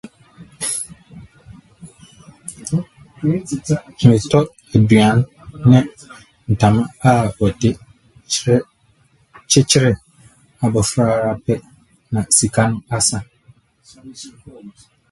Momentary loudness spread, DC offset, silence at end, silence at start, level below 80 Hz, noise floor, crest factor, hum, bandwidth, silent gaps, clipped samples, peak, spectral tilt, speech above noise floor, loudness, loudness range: 17 LU; under 0.1%; 0.4 s; 0.05 s; -44 dBFS; -56 dBFS; 18 dB; none; 12 kHz; none; under 0.1%; 0 dBFS; -5 dB/octave; 41 dB; -16 LUFS; 5 LU